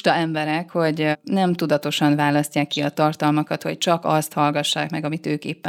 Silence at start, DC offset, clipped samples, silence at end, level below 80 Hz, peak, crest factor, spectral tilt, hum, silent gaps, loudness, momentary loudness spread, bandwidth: 0.05 s; under 0.1%; under 0.1%; 0 s; -68 dBFS; -2 dBFS; 18 dB; -5 dB/octave; none; none; -21 LUFS; 6 LU; 17 kHz